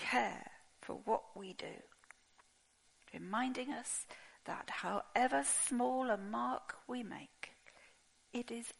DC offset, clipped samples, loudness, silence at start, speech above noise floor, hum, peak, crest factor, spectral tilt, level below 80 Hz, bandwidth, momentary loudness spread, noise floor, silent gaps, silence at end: under 0.1%; under 0.1%; -39 LUFS; 0 s; 33 dB; none; -20 dBFS; 22 dB; -2.5 dB/octave; -76 dBFS; 11.5 kHz; 19 LU; -72 dBFS; none; 0.05 s